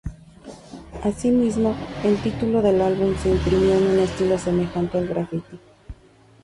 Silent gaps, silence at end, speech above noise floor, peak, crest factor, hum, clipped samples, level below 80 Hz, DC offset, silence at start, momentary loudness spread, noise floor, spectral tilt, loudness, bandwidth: none; 0.5 s; 32 dB; -8 dBFS; 14 dB; none; under 0.1%; -38 dBFS; under 0.1%; 0.05 s; 13 LU; -52 dBFS; -7 dB/octave; -21 LUFS; 11.5 kHz